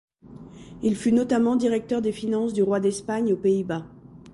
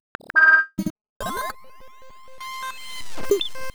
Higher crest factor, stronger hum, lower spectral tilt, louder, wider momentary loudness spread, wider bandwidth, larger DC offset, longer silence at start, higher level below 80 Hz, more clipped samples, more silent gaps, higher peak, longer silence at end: second, 12 dB vs 18 dB; neither; first, -6.5 dB/octave vs -3 dB/octave; second, -24 LUFS vs -20 LUFS; second, 11 LU vs 21 LU; second, 11.5 kHz vs over 20 kHz; neither; about the same, 0.3 s vs 0.2 s; second, -58 dBFS vs -48 dBFS; neither; second, none vs 0.90-1.20 s; second, -12 dBFS vs -6 dBFS; about the same, 0.05 s vs 0 s